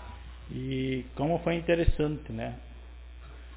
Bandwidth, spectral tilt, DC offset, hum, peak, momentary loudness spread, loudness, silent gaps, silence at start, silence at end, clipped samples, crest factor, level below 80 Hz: 4 kHz; -6 dB/octave; under 0.1%; none; -8 dBFS; 21 LU; -31 LUFS; none; 0 s; 0 s; under 0.1%; 22 dB; -38 dBFS